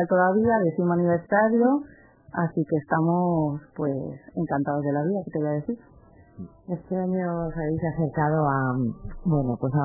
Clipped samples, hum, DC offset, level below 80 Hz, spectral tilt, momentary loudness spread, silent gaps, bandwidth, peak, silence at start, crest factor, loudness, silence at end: under 0.1%; none; under 0.1%; -50 dBFS; -15 dB/octave; 13 LU; none; 2.1 kHz; -8 dBFS; 0 s; 16 dB; -25 LUFS; 0 s